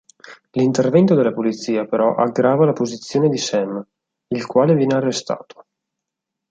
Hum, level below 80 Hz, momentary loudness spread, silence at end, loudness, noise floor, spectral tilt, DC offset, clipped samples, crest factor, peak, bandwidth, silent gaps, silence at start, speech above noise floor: none; -62 dBFS; 12 LU; 1.1 s; -18 LUFS; -82 dBFS; -6 dB/octave; under 0.1%; under 0.1%; 16 dB; -2 dBFS; 9.2 kHz; none; 0.3 s; 65 dB